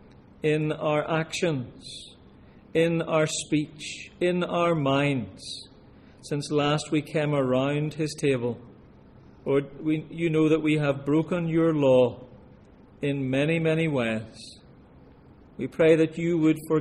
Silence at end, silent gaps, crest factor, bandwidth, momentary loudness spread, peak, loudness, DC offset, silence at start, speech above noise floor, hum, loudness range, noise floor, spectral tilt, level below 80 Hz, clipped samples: 0 s; none; 18 dB; 12.5 kHz; 15 LU; -8 dBFS; -25 LUFS; under 0.1%; 0.45 s; 27 dB; none; 4 LU; -52 dBFS; -6 dB/octave; -58 dBFS; under 0.1%